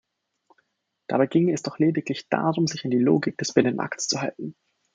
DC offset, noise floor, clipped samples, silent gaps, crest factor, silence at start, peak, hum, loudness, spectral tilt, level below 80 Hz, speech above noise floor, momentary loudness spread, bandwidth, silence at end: under 0.1%; -70 dBFS; under 0.1%; none; 22 dB; 1.1 s; -4 dBFS; none; -24 LUFS; -5 dB/octave; -68 dBFS; 47 dB; 9 LU; 9.4 kHz; 0.4 s